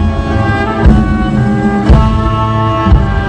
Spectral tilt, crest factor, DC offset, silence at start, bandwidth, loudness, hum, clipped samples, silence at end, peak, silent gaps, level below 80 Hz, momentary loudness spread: -8 dB/octave; 10 dB; under 0.1%; 0 s; 9 kHz; -11 LUFS; none; 0.6%; 0 s; 0 dBFS; none; -14 dBFS; 4 LU